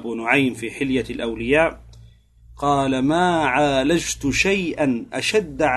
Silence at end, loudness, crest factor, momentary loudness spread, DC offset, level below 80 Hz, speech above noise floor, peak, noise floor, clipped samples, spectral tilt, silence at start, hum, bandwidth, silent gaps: 0 s; -20 LUFS; 18 dB; 5 LU; under 0.1%; -42 dBFS; 28 dB; -2 dBFS; -48 dBFS; under 0.1%; -4.5 dB/octave; 0 s; none; 12.5 kHz; none